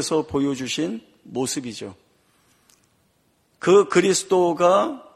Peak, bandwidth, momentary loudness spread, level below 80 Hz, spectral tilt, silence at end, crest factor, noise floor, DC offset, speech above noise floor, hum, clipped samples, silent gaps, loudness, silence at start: -2 dBFS; 14 kHz; 17 LU; -60 dBFS; -4 dB/octave; 0.15 s; 20 dB; -65 dBFS; under 0.1%; 44 dB; none; under 0.1%; none; -20 LUFS; 0 s